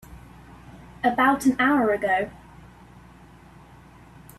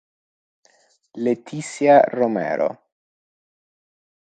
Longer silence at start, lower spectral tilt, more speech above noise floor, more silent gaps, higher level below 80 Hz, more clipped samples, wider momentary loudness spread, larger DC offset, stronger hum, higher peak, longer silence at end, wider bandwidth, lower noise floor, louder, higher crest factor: second, 0.1 s vs 1.15 s; about the same, -5 dB/octave vs -6 dB/octave; second, 28 dB vs 41 dB; neither; first, -52 dBFS vs -74 dBFS; neither; second, 6 LU vs 12 LU; neither; first, 60 Hz at -50 dBFS vs none; second, -6 dBFS vs -2 dBFS; first, 2.05 s vs 1.6 s; first, 14 kHz vs 9.2 kHz; second, -49 dBFS vs -60 dBFS; second, -22 LUFS vs -19 LUFS; about the same, 20 dB vs 20 dB